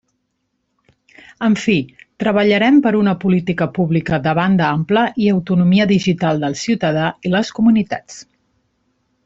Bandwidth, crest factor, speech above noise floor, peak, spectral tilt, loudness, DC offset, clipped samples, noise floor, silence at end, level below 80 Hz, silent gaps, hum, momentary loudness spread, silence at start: 8 kHz; 14 dB; 55 dB; -2 dBFS; -6.5 dB/octave; -16 LUFS; under 0.1%; under 0.1%; -70 dBFS; 1.05 s; -52 dBFS; none; none; 7 LU; 1.4 s